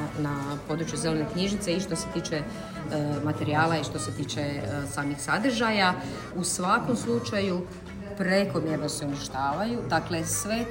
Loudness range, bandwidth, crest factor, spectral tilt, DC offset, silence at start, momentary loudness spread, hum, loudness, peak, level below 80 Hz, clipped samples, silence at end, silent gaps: 3 LU; 16.5 kHz; 18 dB; -4.5 dB/octave; under 0.1%; 0 s; 8 LU; none; -28 LUFS; -10 dBFS; -50 dBFS; under 0.1%; 0 s; none